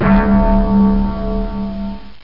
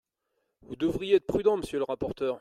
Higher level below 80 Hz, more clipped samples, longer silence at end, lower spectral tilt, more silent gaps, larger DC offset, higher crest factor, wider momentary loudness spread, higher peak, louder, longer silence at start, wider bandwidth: first, -20 dBFS vs -54 dBFS; neither; about the same, 0 s vs 0 s; first, -11 dB/octave vs -6.5 dB/octave; neither; first, 4% vs under 0.1%; second, 12 dB vs 18 dB; first, 12 LU vs 7 LU; first, -2 dBFS vs -12 dBFS; first, -15 LUFS vs -28 LUFS; second, 0 s vs 0.7 s; second, 5.6 kHz vs 13 kHz